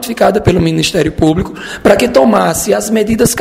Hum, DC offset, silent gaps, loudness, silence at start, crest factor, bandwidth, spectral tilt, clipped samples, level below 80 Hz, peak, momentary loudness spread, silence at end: none; under 0.1%; none; -11 LUFS; 0 s; 10 dB; 16.5 kHz; -5 dB/octave; 0.4%; -32 dBFS; 0 dBFS; 4 LU; 0 s